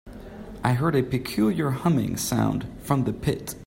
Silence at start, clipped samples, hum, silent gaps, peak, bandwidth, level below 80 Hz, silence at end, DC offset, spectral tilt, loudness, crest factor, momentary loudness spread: 0.05 s; under 0.1%; none; none; -8 dBFS; 16.5 kHz; -46 dBFS; 0 s; under 0.1%; -6 dB/octave; -25 LUFS; 16 dB; 8 LU